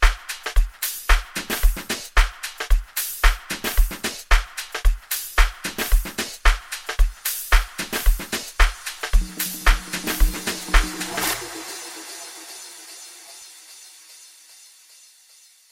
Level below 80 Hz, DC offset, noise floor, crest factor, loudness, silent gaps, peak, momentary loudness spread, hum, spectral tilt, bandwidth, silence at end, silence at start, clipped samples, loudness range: -22 dBFS; under 0.1%; -52 dBFS; 20 dB; -24 LUFS; none; -2 dBFS; 17 LU; none; -2.5 dB/octave; 17 kHz; 2 s; 0 s; under 0.1%; 13 LU